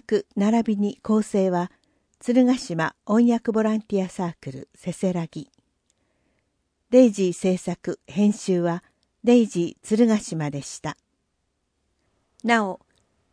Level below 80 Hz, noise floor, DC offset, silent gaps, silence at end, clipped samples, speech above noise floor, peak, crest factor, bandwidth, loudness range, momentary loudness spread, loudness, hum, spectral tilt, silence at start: -64 dBFS; -74 dBFS; under 0.1%; none; 0.55 s; under 0.1%; 52 dB; -4 dBFS; 20 dB; 10.5 kHz; 5 LU; 15 LU; -23 LUFS; none; -6 dB/octave; 0.1 s